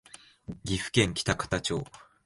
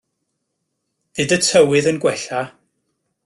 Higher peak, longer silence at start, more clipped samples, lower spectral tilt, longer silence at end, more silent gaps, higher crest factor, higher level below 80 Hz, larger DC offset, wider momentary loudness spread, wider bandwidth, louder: second, -8 dBFS vs -2 dBFS; second, 0.5 s vs 1.15 s; neither; about the same, -4 dB/octave vs -3.5 dB/octave; second, 0.25 s vs 0.8 s; neither; first, 24 dB vs 18 dB; first, -48 dBFS vs -58 dBFS; neither; first, 19 LU vs 15 LU; about the same, 11.5 kHz vs 12.5 kHz; second, -29 LUFS vs -17 LUFS